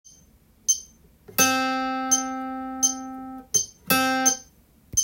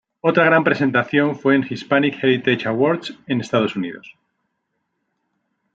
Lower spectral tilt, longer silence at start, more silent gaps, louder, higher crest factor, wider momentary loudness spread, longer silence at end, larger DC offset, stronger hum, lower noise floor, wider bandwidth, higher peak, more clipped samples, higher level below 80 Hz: second, -1 dB/octave vs -6.5 dB/octave; first, 0.7 s vs 0.25 s; neither; second, -23 LUFS vs -18 LUFS; about the same, 20 dB vs 18 dB; about the same, 12 LU vs 10 LU; second, 0 s vs 1.65 s; neither; neither; second, -57 dBFS vs -74 dBFS; first, 17 kHz vs 7.8 kHz; second, -6 dBFS vs -2 dBFS; neither; first, -58 dBFS vs -66 dBFS